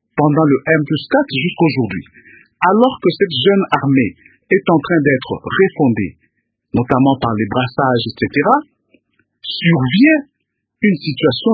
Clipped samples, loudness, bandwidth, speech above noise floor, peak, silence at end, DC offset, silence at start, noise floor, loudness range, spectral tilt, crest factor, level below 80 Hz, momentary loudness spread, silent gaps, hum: under 0.1%; -15 LUFS; 5 kHz; 59 dB; 0 dBFS; 0 s; under 0.1%; 0.15 s; -73 dBFS; 2 LU; -9.5 dB/octave; 16 dB; -48 dBFS; 8 LU; none; none